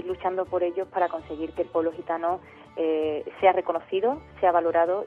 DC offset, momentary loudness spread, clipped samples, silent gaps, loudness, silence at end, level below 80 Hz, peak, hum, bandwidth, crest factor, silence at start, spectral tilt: under 0.1%; 8 LU; under 0.1%; none; -26 LUFS; 0 s; -58 dBFS; -8 dBFS; none; 4.7 kHz; 18 dB; 0 s; -7.5 dB/octave